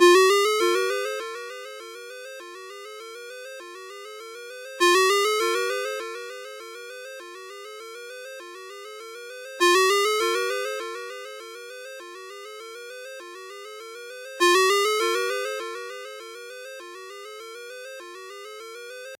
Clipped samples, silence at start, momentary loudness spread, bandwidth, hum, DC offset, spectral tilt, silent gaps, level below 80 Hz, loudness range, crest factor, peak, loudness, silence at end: under 0.1%; 0 s; 20 LU; 16 kHz; none; under 0.1%; 1 dB/octave; none; under -90 dBFS; 14 LU; 22 dB; -4 dBFS; -22 LUFS; 0.05 s